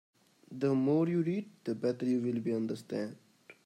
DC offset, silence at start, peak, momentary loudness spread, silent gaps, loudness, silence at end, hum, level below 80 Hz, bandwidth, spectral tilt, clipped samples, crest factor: under 0.1%; 0.5 s; -18 dBFS; 10 LU; none; -33 LUFS; 0.15 s; none; -80 dBFS; 12 kHz; -8.5 dB/octave; under 0.1%; 14 dB